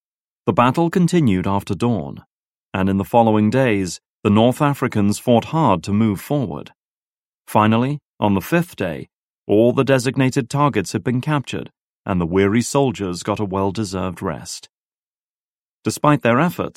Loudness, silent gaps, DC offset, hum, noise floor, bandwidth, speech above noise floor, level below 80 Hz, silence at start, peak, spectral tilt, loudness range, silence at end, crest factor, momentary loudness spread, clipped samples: -19 LUFS; 2.26-2.69 s, 4.08-4.23 s, 6.75-7.41 s, 8.06-8.14 s, 9.13-9.46 s, 11.81-12.04 s, 14.69-15.83 s; under 0.1%; none; under -90 dBFS; 16 kHz; over 72 dB; -52 dBFS; 0.45 s; 0 dBFS; -6.5 dB/octave; 4 LU; 0.05 s; 18 dB; 12 LU; under 0.1%